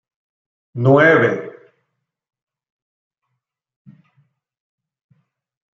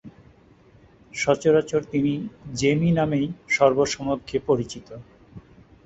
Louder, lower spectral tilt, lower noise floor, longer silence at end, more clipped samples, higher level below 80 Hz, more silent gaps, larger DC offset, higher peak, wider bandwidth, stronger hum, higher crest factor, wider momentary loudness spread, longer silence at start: first, -14 LUFS vs -23 LUFS; first, -8 dB/octave vs -5.5 dB/octave; first, -77 dBFS vs -54 dBFS; first, 4.25 s vs 0.45 s; neither; second, -66 dBFS vs -52 dBFS; neither; neither; about the same, -2 dBFS vs -4 dBFS; second, 7.2 kHz vs 8.2 kHz; neither; about the same, 20 dB vs 20 dB; first, 23 LU vs 15 LU; first, 0.75 s vs 0.05 s